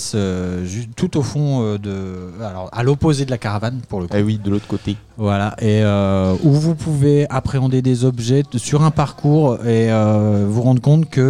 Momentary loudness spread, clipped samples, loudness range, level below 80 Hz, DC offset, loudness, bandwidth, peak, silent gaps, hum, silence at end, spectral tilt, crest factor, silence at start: 9 LU; under 0.1%; 5 LU; -44 dBFS; 0.4%; -17 LUFS; 11 kHz; -2 dBFS; none; none; 0 s; -7 dB/octave; 14 dB; 0 s